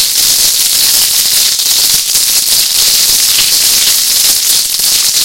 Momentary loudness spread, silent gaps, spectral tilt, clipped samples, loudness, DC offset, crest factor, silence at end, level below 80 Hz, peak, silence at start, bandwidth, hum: 1 LU; none; 2.5 dB/octave; 0.5%; -6 LUFS; 0.6%; 8 dB; 0 s; -42 dBFS; 0 dBFS; 0 s; over 20 kHz; none